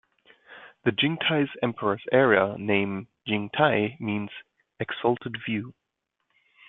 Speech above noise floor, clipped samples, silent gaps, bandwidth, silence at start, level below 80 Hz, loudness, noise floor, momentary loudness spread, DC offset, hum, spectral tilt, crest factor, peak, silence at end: 55 dB; under 0.1%; none; 4.1 kHz; 0.5 s; -66 dBFS; -26 LUFS; -81 dBFS; 12 LU; under 0.1%; none; -9.5 dB/octave; 22 dB; -4 dBFS; 0.95 s